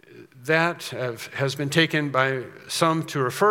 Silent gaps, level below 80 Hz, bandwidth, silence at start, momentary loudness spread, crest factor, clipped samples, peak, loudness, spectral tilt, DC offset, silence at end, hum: none; -74 dBFS; 17 kHz; 0.15 s; 9 LU; 22 dB; under 0.1%; -2 dBFS; -24 LUFS; -4.5 dB/octave; under 0.1%; 0 s; none